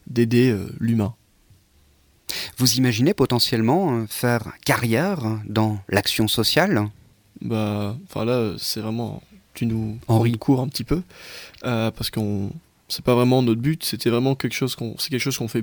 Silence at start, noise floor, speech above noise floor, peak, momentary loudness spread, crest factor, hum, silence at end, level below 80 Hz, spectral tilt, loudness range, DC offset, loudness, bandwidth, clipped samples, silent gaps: 0.1 s; -58 dBFS; 36 dB; -2 dBFS; 11 LU; 20 dB; none; 0 s; -48 dBFS; -5 dB/octave; 4 LU; under 0.1%; -22 LUFS; over 20 kHz; under 0.1%; none